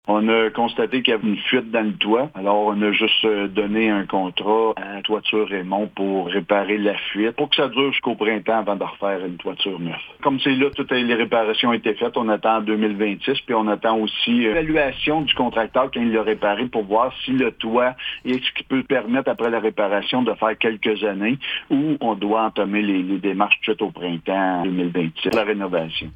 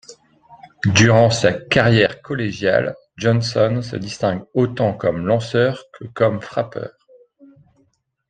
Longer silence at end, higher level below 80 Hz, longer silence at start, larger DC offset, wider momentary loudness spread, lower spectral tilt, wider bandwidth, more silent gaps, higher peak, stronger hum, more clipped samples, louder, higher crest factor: second, 0 s vs 1.4 s; about the same, -52 dBFS vs -50 dBFS; about the same, 0.05 s vs 0.1 s; neither; second, 5 LU vs 13 LU; first, -7 dB/octave vs -5.5 dB/octave; second, 7.6 kHz vs 9.2 kHz; neither; about the same, -2 dBFS vs 0 dBFS; neither; neither; about the same, -20 LUFS vs -18 LUFS; about the same, 18 dB vs 18 dB